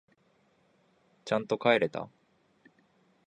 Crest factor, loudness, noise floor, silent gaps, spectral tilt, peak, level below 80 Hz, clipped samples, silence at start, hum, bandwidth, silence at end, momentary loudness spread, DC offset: 24 dB; -29 LUFS; -69 dBFS; none; -5.5 dB/octave; -10 dBFS; -76 dBFS; under 0.1%; 1.25 s; none; 9.6 kHz; 1.2 s; 20 LU; under 0.1%